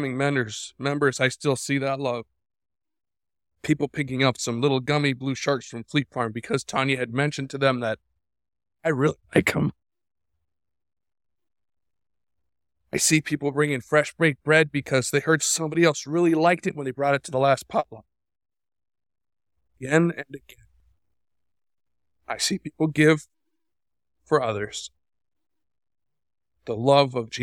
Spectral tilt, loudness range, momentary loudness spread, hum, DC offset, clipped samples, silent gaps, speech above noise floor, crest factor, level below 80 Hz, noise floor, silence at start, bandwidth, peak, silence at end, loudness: -4.5 dB/octave; 9 LU; 10 LU; none; under 0.1%; under 0.1%; none; 60 dB; 24 dB; -62 dBFS; -83 dBFS; 0 s; 17 kHz; -2 dBFS; 0 s; -24 LUFS